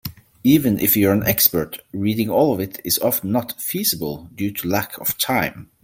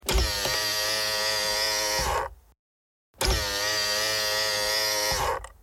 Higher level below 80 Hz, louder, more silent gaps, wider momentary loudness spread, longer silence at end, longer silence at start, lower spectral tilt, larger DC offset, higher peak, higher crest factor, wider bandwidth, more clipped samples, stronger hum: second, -50 dBFS vs -38 dBFS; first, -19 LUFS vs -25 LUFS; second, none vs 2.59-3.14 s; first, 10 LU vs 4 LU; about the same, 0.2 s vs 0.15 s; about the same, 0.05 s vs 0.05 s; first, -4.5 dB/octave vs -1.5 dB/octave; neither; first, 0 dBFS vs -10 dBFS; about the same, 20 dB vs 18 dB; about the same, 17 kHz vs 17 kHz; neither; neither